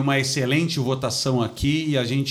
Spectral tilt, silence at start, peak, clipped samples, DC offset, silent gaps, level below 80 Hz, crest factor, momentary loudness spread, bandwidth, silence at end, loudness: -5 dB/octave; 0 s; -8 dBFS; under 0.1%; under 0.1%; none; -44 dBFS; 14 dB; 2 LU; 15.5 kHz; 0 s; -22 LUFS